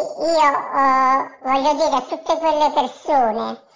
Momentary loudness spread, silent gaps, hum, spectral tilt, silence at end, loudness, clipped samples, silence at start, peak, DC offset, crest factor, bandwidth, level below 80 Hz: 6 LU; none; none; -3 dB/octave; 0.2 s; -18 LUFS; under 0.1%; 0 s; -4 dBFS; 0.6%; 14 dB; 7.6 kHz; -58 dBFS